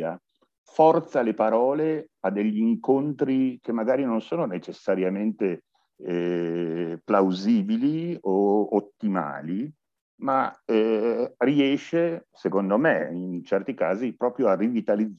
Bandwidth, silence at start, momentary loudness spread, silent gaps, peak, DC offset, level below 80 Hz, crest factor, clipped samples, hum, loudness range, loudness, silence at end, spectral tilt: 7.2 kHz; 0 s; 9 LU; 0.58-0.64 s, 10.01-10.18 s; -6 dBFS; under 0.1%; -76 dBFS; 18 dB; under 0.1%; none; 3 LU; -25 LUFS; 0.05 s; -8 dB/octave